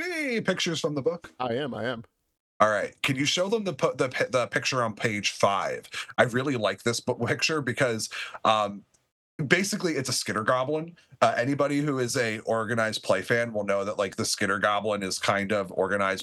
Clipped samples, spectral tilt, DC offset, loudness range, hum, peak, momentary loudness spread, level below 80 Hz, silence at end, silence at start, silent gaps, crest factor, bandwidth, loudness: under 0.1%; -4 dB/octave; under 0.1%; 1 LU; none; -4 dBFS; 7 LU; -70 dBFS; 0 s; 0 s; 2.40-2.60 s, 9.12-9.39 s; 22 dB; 13 kHz; -26 LUFS